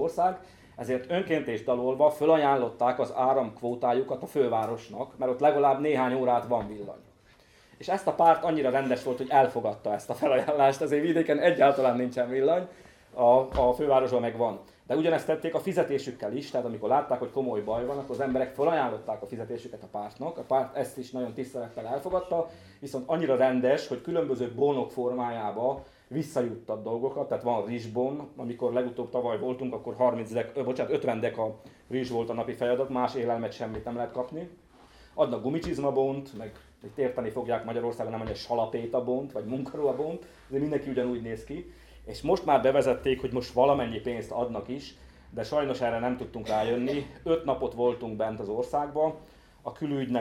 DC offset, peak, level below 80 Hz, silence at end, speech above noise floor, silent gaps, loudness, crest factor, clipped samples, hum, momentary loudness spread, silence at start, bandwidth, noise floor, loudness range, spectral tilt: under 0.1%; -8 dBFS; -56 dBFS; 0 s; 31 dB; none; -28 LUFS; 20 dB; under 0.1%; none; 13 LU; 0 s; 15 kHz; -59 dBFS; 7 LU; -6.5 dB/octave